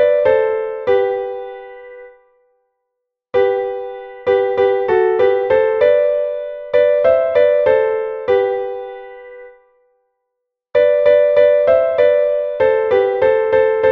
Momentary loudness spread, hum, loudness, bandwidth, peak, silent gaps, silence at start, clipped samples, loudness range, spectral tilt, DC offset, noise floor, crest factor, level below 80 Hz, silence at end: 15 LU; none; -15 LUFS; 4.8 kHz; -2 dBFS; none; 0 s; under 0.1%; 8 LU; -7 dB/octave; under 0.1%; -77 dBFS; 14 dB; -52 dBFS; 0 s